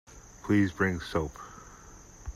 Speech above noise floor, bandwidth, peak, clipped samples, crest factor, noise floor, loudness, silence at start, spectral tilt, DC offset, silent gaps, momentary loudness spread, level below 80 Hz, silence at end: 22 dB; 13.5 kHz; -12 dBFS; under 0.1%; 20 dB; -51 dBFS; -29 LUFS; 0.1 s; -6.5 dB/octave; under 0.1%; none; 24 LU; -50 dBFS; 0 s